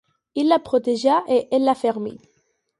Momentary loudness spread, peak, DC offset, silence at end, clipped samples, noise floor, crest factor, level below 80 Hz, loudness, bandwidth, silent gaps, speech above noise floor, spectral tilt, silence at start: 11 LU; -4 dBFS; under 0.1%; 0.65 s; under 0.1%; -67 dBFS; 16 dB; -64 dBFS; -20 LUFS; 11.5 kHz; none; 48 dB; -5 dB/octave; 0.35 s